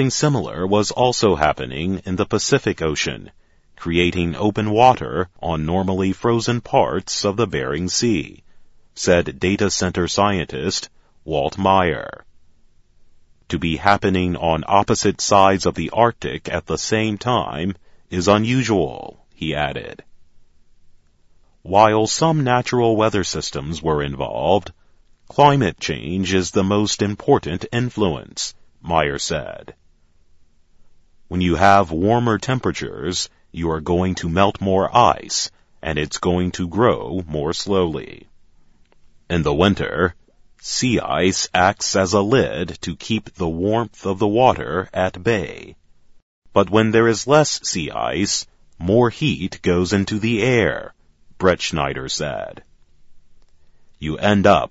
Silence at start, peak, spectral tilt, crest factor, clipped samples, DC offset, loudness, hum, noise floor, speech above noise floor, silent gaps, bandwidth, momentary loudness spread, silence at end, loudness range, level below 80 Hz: 0 s; 0 dBFS; -4.5 dB/octave; 20 dB; under 0.1%; under 0.1%; -19 LUFS; none; -53 dBFS; 35 dB; 46.22-46.42 s; 8 kHz; 11 LU; 0.05 s; 4 LU; -42 dBFS